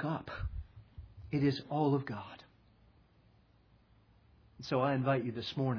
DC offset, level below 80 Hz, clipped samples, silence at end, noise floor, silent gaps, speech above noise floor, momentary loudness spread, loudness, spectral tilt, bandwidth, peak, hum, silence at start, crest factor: under 0.1%; -54 dBFS; under 0.1%; 0 s; -66 dBFS; none; 33 dB; 22 LU; -35 LUFS; -6 dB/octave; 5.4 kHz; -18 dBFS; none; 0 s; 18 dB